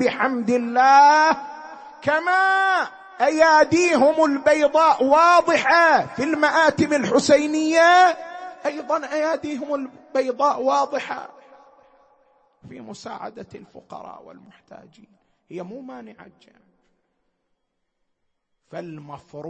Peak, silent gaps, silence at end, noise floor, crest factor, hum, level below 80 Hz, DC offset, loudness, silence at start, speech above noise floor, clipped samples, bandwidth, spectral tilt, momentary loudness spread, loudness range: -4 dBFS; none; 0 s; -74 dBFS; 18 dB; none; -64 dBFS; under 0.1%; -18 LUFS; 0 s; 55 dB; under 0.1%; 8.8 kHz; -3.5 dB/octave; 22 LU; 23 LU